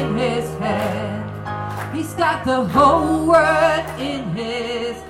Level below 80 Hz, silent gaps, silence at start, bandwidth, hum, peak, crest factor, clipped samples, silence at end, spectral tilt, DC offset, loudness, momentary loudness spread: -42 dBFS; none; 0 s; 16.5 kHz; none; -2 dBFS; 16 dB; under 0.1%; 0 s; -5.5 dB/octave; under 0.1%; -19 LUFS; 12 LU